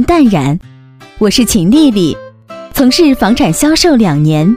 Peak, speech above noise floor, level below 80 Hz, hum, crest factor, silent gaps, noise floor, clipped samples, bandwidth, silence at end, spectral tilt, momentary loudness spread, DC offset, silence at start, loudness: 0 dBFS; 25 dB; -30 dBFS; none; 10 dB; none; -34 dBFS; 0.1%; 16.5 kHz; 0 s; -5 dB/octave; 8 LU; under 0.1%; 0 s; -9 LUFS